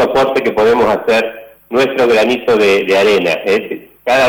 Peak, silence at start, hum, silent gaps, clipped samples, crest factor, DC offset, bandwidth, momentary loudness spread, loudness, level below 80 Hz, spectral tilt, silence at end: -6 dBFS; 0 s; none; none; under 0.1%; 6 dB; under 0.1%; over 20 kHz; 7 LU; -12 LUFS; -48 dBFS; -4.5 dB/octave; 0 s